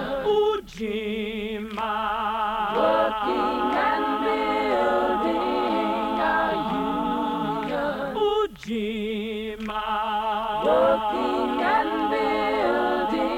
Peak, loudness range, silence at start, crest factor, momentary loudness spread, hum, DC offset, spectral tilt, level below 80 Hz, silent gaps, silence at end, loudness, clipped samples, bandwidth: -10 dBFS; 3 LU; 0 s; 14 dB; 7 LU; none; under 0.1%; -5.5 dB/octave; -50 dBFS; none; 0 s; -24 LUFS; under 0.1%; 16 kHz